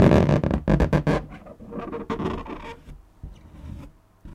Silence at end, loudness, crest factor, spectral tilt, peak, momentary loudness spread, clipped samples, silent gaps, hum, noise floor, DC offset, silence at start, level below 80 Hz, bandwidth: 0 s; -23 LUFS; 22 dB; -8.5 dB/octave; -2 dBFS; 24 LU; under 0.1%; none; none; -45 dBFS; under 0.1%; 0 s; -34 dBFS; 10.5 kHz